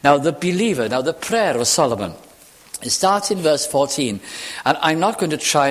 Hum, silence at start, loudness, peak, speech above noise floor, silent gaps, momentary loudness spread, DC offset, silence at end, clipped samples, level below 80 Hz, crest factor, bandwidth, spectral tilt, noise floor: none; 0.05 s; -19 LUFS; 0 dBFS; 28 dB; none; 10 LU; under 0.1%; 0 s; under 0.1%; -54 dBFS; 18 dB; 16 kHz; -3.5 dB/octave; -46 dBFS